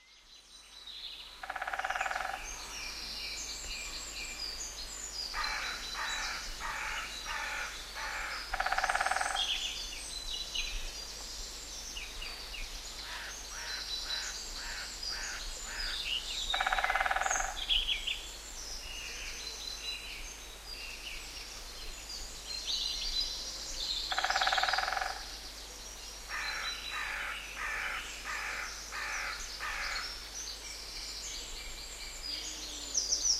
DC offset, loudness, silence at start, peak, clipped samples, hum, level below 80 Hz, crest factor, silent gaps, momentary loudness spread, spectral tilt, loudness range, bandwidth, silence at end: under 0.1%; -36 LUFS; 0 s; -14 dBFS; under 0.1%; none; -50 dBFS; 24 dB; none; 12 LU; 0.5 dB/octave; 7 LU; 16 kHz; 0 s